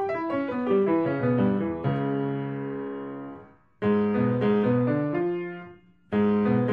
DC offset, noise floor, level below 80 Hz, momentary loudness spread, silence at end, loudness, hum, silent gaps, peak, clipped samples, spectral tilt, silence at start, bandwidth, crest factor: under 0.1%; -49 dBFS; -60 dBFS; 12 LU; 0 s; -26 LUFS; none; none; -10 dBFS; under 0.1%; -10.5 dB/octave; 0 s; 5 kHz; 14 dB